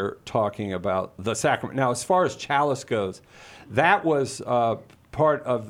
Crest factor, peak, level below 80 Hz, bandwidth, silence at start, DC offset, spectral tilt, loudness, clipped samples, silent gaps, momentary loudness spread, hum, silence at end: 20 dB; -4 dBFS; -58 dBFS; 16 kHz; 0 s; under 0.1%; -5 dB/octave; -24 LUFS; under 0.1%; none; 8 LU; none; 0 s